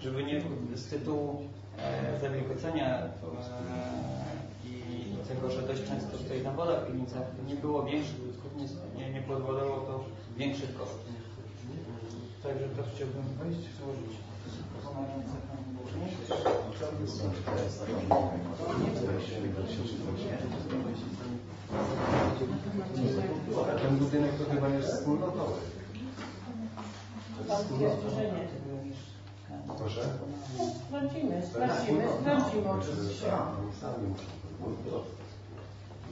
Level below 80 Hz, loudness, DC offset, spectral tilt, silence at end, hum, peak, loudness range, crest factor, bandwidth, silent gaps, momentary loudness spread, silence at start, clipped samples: -58 dBFS; -35 LUFS; under 0.1%; -7 dB/octave; 0 s; none; -12 dBFS; 7 LU; 22 dB; 7.8 kHz; none; 13 LU; 0 s; under 0.1%